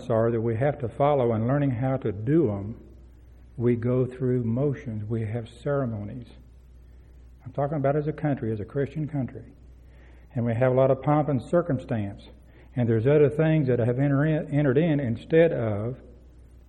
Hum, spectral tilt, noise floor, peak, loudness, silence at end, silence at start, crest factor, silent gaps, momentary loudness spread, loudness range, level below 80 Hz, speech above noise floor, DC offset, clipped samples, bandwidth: none; -10 dB/octave; -50 dBFS; -8 dBFS; -25 LUFS; 0.4 s; 0 s; 18 dB; none; 14 LU; 7 LU; -50 dBFS; 25 dB; under 0.1%; under 0.1%; 8.8 kHz